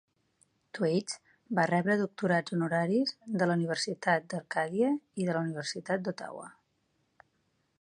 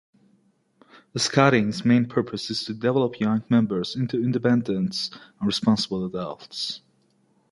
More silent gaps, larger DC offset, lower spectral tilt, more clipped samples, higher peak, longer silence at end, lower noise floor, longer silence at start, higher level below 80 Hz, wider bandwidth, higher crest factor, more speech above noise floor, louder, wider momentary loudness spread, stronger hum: neither; neither; about the same, -5.5 dB/octave vs -5.5 dB/octave; neither; second, -12 dBFS vs -2 dBFS; first, 1.3 s vs 0.75 s; first, -76 dBFS vs -65 dBFS; second, 0.75 s vs 1.15 s; second, -78 dBFS vs -60 dBFS; about the same, 10.5 kHz vs 11.5 kHz; about the same, 20 dB vs 22 dB; first, 45 dB vs 41 dB; second, -31 LUFS vs -24 LUFS; about the same, 13 LU vs 11 LU; neither